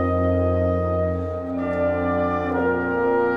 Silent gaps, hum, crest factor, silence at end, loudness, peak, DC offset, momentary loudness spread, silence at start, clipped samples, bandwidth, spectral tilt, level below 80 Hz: none; none; 12 dB; 0 s; -22 LUFS; -10 dBFS; under 0.1%; 5 LU; 0 s; under 0.1%; 5 kHz; -10 dB/octave; -40 dBFS